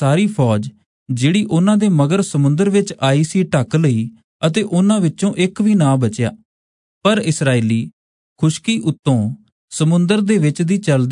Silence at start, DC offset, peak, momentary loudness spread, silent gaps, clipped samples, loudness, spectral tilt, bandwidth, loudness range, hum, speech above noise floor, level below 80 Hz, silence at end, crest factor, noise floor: 0 s; under 0.1%; -2 dBFS; 7 LU; 0.86-1.06 s, 4.24-4.40 s, 6.45-7.01 s, 7.93-8.36 s, 8.99-9.03 s, 9.52-9.68 s; under 0.1%; -16 LUFS; -6.5 dB/octave; 11 kHz; 3 LU; none; over 75 dB; -58 dBFS; 0 s; 14 dB; under -90 dBFS